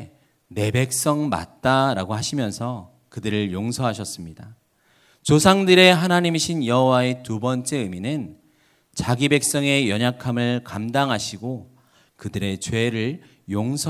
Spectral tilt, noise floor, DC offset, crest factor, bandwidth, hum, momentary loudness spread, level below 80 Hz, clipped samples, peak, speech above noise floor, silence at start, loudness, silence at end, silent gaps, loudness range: -4.5 dB/octave; -60 dBFS; under 0.1%; 22 dB; 16 kHz; none; 16 LU; -50 dBFS; under 0.1%; 0 dBFS; 39 dB; 0 s; -21 LUFS; 0 s; none; 8 LU